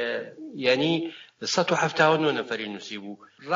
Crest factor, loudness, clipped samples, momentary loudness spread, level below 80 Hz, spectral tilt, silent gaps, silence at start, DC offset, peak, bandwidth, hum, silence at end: 20 dB; -25 LUFS; under 0.1%; 17 LU; -72 dBFS; -4 dB/octave; none; 0 s; under 0.1%; -6 dBFS; 7.6 kHz; none; 0 s